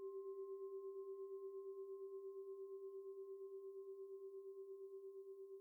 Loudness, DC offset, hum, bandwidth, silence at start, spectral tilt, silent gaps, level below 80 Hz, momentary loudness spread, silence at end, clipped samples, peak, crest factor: -53 LUFS; under 0.1%; none; 18.5 kHz; 0 s; -6.5 dB/octave; none; under -90 dBFS; 4 LU; 0 s; under 0.1%; -44 dBFS; 8 dB